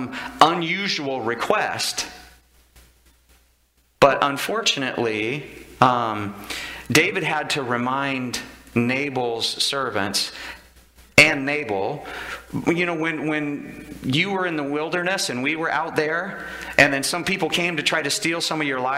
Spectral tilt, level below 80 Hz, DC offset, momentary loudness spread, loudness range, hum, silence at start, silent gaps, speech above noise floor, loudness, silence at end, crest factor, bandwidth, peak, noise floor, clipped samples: -3.5 dB/octave; -52 dBFS; under 0.1%; 13 LU; 4 LU; none; 0 s; none; 39 dB; -21 LUFS; 0 s; 22 dB; 16 kHz; 0 dBFS; -62 dBFS; under 0.1%